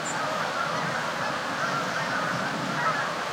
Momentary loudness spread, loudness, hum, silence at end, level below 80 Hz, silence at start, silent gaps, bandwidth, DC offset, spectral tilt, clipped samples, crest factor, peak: 2 LU; -27 LUFS; none; 0 s; -68 dBFS; 0 s; none; 16.5 kHz; under 0.1%; -3.5 dB/octave; under 0.1%; 14 dB; -14 dBFS